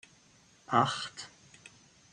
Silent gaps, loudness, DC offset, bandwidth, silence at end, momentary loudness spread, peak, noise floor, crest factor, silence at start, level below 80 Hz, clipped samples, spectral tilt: none; -31 LUFS; under 0.1%; 10.5 kHz; 0.85 s; 25 LU; -12 dBFS; -63 dBFS; 22 dB; 0.7 s; -74 dBFS; under 0.1%; -4 dB/octave